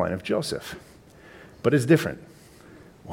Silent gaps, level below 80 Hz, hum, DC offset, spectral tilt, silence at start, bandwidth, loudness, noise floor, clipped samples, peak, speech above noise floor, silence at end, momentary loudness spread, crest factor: none; -56 dBFS; none; under 0.1%; -6 dB/octave; 0 s; 17 kHz; -24 LUFS; -49 dBFS; under 0.1%; -6 dBFS; 25 dB; 0 s; 22 LU; 22 dB